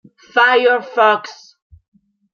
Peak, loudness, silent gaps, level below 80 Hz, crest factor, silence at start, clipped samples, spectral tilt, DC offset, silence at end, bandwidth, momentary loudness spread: -2 dBFS; -14 LUFS; none; -62 dBFS; 16 dB; 0.35 s; under 0.1%; -3 dB/octave; under 0.1%; 1 s; 7 kHz; 9 LU